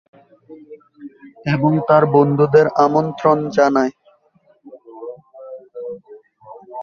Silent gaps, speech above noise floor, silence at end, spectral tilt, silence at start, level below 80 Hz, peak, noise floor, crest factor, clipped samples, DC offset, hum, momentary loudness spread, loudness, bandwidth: none; 41 dB; 0 s; -8 dB/octave; 0.5 s; -58 dBFS; -2 dBFS; -57 dBFS; 16 dB; under 0.1%; under 0.1%; none; 23 LU; -15 LUFS; 7 kHz